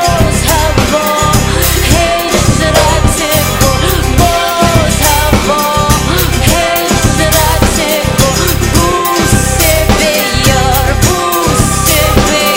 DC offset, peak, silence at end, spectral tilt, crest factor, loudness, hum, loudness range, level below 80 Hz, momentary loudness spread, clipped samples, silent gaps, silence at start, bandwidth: under 0.1%; 0 dBFS; 0 s; -4 dB/octave; 8 dB; -9 LUFS; none; 0 LU; -16 dBFS; 2 LU; 0.6%; none; 0 s; 16.5 kHz